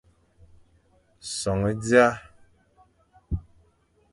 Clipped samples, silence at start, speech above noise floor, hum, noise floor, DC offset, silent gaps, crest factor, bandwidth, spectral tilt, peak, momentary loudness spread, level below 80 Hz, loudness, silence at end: under 0.1%; 1.25 s; 42 dB; none; -64 dBFS; under 0.1%; none; 24 dB; 11.5 kHz; -5 dB/octave; -4 dBFS; 18 LU; -44 dBFS; -24 LUFS; 0.7 s